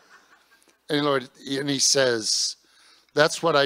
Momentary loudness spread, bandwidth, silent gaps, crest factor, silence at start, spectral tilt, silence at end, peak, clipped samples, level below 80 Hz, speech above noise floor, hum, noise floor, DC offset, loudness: 11 LU; 16 kHz; none; 22 dB; 0.9 s; -2 dB/octave; 0 s; -2 dBFS; under 0.1%; -74 dBFS; 38 dB; none; -60 dBFS; under 0.1%; -22 LUFS